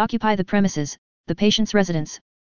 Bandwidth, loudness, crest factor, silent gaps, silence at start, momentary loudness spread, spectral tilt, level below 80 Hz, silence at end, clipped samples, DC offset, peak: 7.2 kHz; -21 LUFS; 18 dB; 0.98-1.24 s; 0 s; 12 LU; -5 dB/octave; -48 dBFS; 0.25 s; under 0.1%; 2%; -4 dBFS